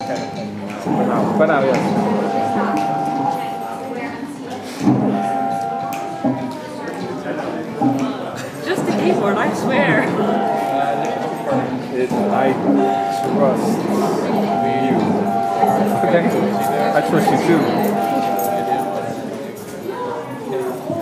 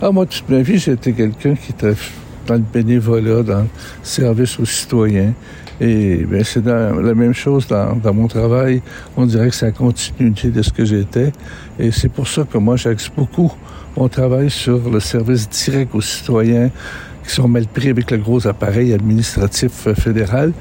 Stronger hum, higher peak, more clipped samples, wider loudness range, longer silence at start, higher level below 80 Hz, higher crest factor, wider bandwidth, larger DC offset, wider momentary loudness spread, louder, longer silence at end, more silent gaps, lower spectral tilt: neither; about the same, -2 dBFS vs -4 dBFS; neither; first, 5 LU vs 2 LU; about the same, 0 s vs 0 s; second, -60 dBFS vs -34 dBFS; about the same, 16 dB vs 12 dB; about the same, 16 kHz vs 16.5 kHz; neither; first, 11 LU vs 5 LU; second, -19 LUFS vs -15 LUFS; about the same, 0 s vs 0 s; neither; about the same, -6.5 dB/octave vs -6 dB/octave